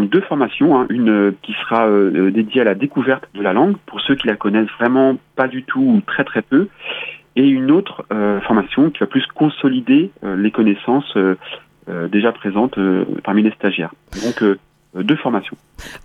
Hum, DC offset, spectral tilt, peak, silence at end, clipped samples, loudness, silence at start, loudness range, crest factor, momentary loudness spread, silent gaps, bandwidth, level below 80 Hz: none; under 0.1%; -7 dB/octave; -2 dBFS; 0.05 s; under 0.1%; -16 LUFS; 0 s; 3 LU; 14 dB; 10 LU; none; 7.4 kHz; -52 dBFS